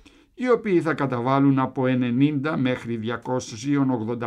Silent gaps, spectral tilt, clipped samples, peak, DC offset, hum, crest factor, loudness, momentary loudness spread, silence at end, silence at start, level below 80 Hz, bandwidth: none; -7 dB/octave; under 0.1%; -8 dBFS; under 0.1%; none; 16 dB; -23 LUFS; 8 LU; 0 s; 0.4 s; -62 dBFS; 9.2 kHz